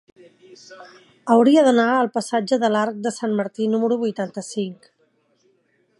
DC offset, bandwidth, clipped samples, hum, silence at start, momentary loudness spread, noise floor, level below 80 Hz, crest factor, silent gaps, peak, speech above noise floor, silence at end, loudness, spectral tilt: under 0.1%; 11.5 kHz; under 0.1%; none; 0.7 s; 14 LU; -64 dBFS; -76 dBFS; 18 dB; none; -2 dBFS; 44 dB; 1.25 s; -20 LUFS; -5 dB/octave